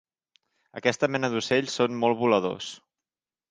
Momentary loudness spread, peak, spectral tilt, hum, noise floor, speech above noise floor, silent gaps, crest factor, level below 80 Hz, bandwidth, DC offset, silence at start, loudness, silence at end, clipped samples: 14 LU; -4 dBFS; -4.5 dB/octave; none; under -90 dBFS; over 65 dB; none; 22 dB; -70 dBFS; 9.8 kHz; under 0.1%; 0.75 s; -25 LUFS; 0.75 s; under 0.1%